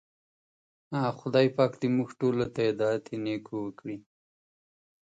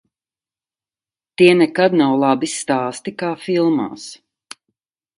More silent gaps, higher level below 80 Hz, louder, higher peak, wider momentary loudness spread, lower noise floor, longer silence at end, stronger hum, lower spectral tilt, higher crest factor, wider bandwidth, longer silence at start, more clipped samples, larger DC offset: neither; about the same, -68 dBFS vs -66 dBFS; second, -29 LUFS vs -17 LUFS; second, -10 dBFS vs 0 dBFS; second, 12 LU vs 15 LU; about the same, under -90 dBFS vs under -90 dBFS; about the same, 1.05 s vs 1.05 s; neither; first, -7.5 dB/octave vs -5 dB/octave; about the same, 20 dB vs 18 dB; second, 9 kHz vs 11.5 kHz; second, 0.9 s vs 1.4 s; neither; neither